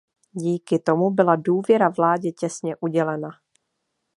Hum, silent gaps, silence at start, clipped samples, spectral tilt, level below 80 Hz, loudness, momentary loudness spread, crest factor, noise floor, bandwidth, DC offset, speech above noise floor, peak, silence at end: none; none; 0.35 s; under 0.1%; -7 dB/octave; -74 dBFS; -22 LUFS; 10 LU; 20 dB; -76 dBFS; 11.5 kHz; under 0.1%; 56 dB; -2 dBFS; 0.85 s